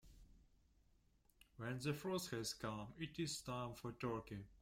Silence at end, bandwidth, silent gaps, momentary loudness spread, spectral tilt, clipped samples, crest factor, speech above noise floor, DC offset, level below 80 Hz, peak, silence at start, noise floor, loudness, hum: 0 s; 16.5 kHz; none; 6 LU; -4.5 dB/octave; under 0.1%; 18 dB; 29 dB; under 0.1%; -70 dBFS; -30 dBFS; 0.05 s; -75 dBFS; -47 LUFS; none